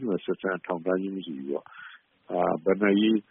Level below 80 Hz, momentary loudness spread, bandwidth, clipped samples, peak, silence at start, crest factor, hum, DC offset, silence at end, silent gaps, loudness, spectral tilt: -68 dBFS; 15 LU; 3.8 kHz; under 0.1%; -10 dBFS; 0 s; 18 dB; none; under 0.1%; 0.1 s; none; -27 LUFS; -5 dB/octave